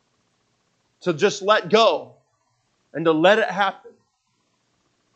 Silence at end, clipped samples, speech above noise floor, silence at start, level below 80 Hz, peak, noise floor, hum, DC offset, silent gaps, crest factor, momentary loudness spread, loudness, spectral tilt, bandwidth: 1.25 s; under 0.1%; 51 dB; 1.05 s; -80 dBFS; -2 dBFS; -70 dBFS; none; under 0.1%; none; 20 dB; 12 LU; -19 LUFS; -4 dB/octave; 8.4 kHz